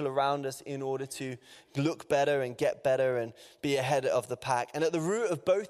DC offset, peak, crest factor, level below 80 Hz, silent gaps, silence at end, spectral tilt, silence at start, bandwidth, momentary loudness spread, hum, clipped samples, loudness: under 0.1%; -12 dBFS; 18 dB; -70 dBFS; none; 0 s; -5 dB/octave; 0 s; 14.5 kHz; 10 LU; none; under 0.1%; -31 LUFS